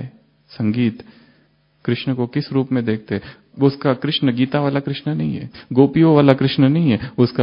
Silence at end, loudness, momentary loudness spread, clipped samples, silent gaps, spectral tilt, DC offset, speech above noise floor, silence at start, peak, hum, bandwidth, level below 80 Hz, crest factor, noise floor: 0 s; -18 LUFS; 13 LU; under 0.1%; none; -10.5 dB/octave; under 0.1%; 41 dB; 0 s; 0 dBFS; none; 5.4 kHz; -54 dBFS; 18 dB; -58 dBFS